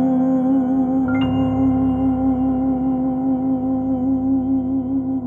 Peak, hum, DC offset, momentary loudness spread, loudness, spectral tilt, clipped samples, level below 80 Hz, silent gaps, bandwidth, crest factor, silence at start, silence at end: -10 dBFS; none; under 0.1%; 3 LU; -19 LUFS; -10 dB/octave; under 0.1%; -40 dBFS; none; 3.1 kHz; 10 dB; 0 s; 0 s